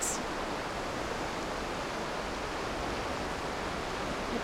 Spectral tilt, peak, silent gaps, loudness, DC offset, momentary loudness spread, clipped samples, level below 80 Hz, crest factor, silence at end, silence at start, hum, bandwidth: -3.5 dB/octave; -20 dBFS; none; -35 LUFS; under 0.1%; 1 LU; under 0.1%; -48 dBFS; 16 dB; 0 s; 0 s; none; over 20 kHz